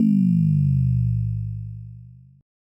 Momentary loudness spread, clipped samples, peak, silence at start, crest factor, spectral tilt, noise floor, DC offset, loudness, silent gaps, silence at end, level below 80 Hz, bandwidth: 18 LU; under 0.1%; -10 dBFS; 0 s; 12 dB; -11.5 dB/octave; -44 dBFS; under 0.1%; -21 LUFS; none; 0.55 s; -38 dBFS; 5.2 kHz